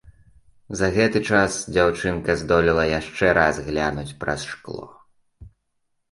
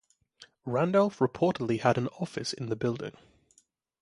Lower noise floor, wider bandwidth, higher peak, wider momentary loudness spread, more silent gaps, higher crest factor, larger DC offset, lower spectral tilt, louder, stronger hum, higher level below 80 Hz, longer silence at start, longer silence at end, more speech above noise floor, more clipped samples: first, -72 dBFS vs -68 dBFS; about the same, 11.5 kHz vs 11.5 kHz; first, -2 dBFS vs -8 dBFS; first, 13 LU vs 10 LU; neither; about the same, 20 dB vs 22 dB; neither; second, -5 dB/octave vs -6.5 dB/octave; first, -21 LUFS vs -29 LUFS; neither; first, -42 dBFS vs -66 dBFS; second, 0.05 s vs 0.4 s; second, 0.65 s vs 0.9 s; first, 51 dB vs 40 dB; neither